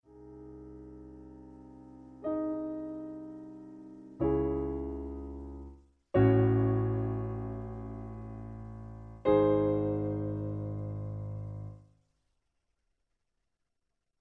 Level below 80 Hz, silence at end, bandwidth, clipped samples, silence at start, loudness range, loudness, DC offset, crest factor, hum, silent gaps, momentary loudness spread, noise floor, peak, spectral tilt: -50 dBFS; 2.45 s; 4 kHz; under 0.1%; 0.1 s; 10 LU; -32 LUFS; under 0.1%; 20 dB; none; none; 24 LU; -85 dBFS; -12 dBFS; -11.5 dB/octave